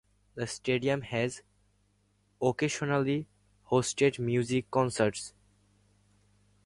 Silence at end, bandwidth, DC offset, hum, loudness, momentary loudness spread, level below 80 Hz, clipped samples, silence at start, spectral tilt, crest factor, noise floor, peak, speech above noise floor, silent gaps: 1.35 s; 11.5 kHz; under 0.1%; 50 Hz at -55 dBFS; -30 LUFS; 13 LU; -64 dBFS; under 0.1%; 0.35 s; -5 dB/octave; 20 dB; -70 dBFS; -12 dBFS; 41 dB; none